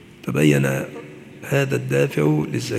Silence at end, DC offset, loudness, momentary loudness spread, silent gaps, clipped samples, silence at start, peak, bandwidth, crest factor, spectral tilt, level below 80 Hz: 0 s; under 0.1%; -20 LUFS; 19 LU; none; under 0.1%; 0.25 s; -4 dBFS; 15 kHz; 18 dB; -6.5 dB/octave; -56 dBFS